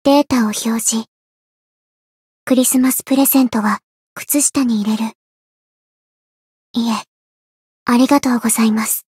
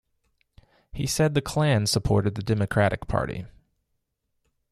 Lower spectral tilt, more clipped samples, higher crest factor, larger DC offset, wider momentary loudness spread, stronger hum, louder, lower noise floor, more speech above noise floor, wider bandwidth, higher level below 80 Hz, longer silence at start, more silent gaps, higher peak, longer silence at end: second, -3.5 dB/octave vs -5.5 dB/octave; neither; about the same, 16 dB vs 18 dB; neither; about the same, 12 LU vs 10 LU; neither; first, -15 LUFS vs -25 LUFS; first, under -90 dBFS vs -77 dBFS; first, over 75 dB vs 53 dB; first, 16.5 kHz vs 14 kHz; second, -60 dBFS vs -44 dBFS; second, 0.05 s vs 0.95 s; first, 1.08-2.47 s, 3.83-4.16 s, 5.15-6.74 s, 7.08-7.86 s vs none; first, -2 dBFS vs -8 dBFS; second, 0.15 s vs 1.25 s